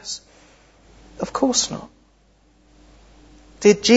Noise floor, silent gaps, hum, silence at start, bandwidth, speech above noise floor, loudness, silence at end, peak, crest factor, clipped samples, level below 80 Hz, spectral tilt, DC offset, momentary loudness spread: -57 dBFS; none; none; 0.05 s; 8 kHz; 40 dB; -21 LUFS; 0 s; 0 dBFS; 22 dB; under 0.1%; -52 dBFS; -3 dB/octave; under 0.1%; 16 LU